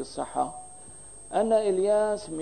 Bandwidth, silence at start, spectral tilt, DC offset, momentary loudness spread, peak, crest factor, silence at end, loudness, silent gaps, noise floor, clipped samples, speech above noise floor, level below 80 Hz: 10.5 kHz; 0 s; -4.5 dB/octave; 0.3%; 20 LU; -12 dBFS; 16 dB; 0 s; -26 LUFS; none; -47 dBFS; under 0.1%; 21 dB; -60 dBFS